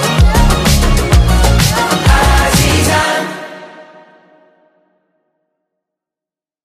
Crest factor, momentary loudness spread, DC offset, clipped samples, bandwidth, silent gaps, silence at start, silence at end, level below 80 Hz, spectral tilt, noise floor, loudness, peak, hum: 12 dB; 10 LU; under 0.1%; under 0.1%; 16 kHz; none; 0 s; 2.8 s; -16 dBFS; -4.5 dB/octave; -88 dBFS; -11 LUFS; 0 dBFS; none